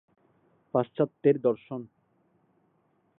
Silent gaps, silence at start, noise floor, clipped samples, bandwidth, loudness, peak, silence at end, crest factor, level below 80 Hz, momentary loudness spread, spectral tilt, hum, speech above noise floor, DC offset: none; 0.75 s; -70 dBFS; under 0.1%; 3.9 kHz; -28 LUFS; -10 dBFS; 1.35 s; 20 dB; -78 dBFS; 14 LU; -11.5 dB/octave; none; 43 dB; under 0.1%